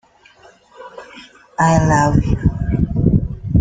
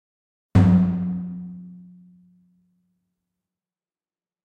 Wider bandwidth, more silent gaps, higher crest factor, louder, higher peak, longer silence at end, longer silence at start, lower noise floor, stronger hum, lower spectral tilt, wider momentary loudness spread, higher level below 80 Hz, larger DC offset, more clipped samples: first, 9.4 kHz vs 6.8 kHz; neither; about the same, 16 dB vs 20 dB; first, -16 LUFS vs -20 LUFS; first, -2 dBFS vs -6 dBFS; second, 0 s vs 2.65 s; first, 0.8 s vs 0.55 s; second, -48 dBFS vs under -90 dBFS; neither; second, -7 dB/octave vs -10 dB/octave; about the same, 23 LU vs 23 LU; first, -28 dBFS vs -44 dBFS; neither; neither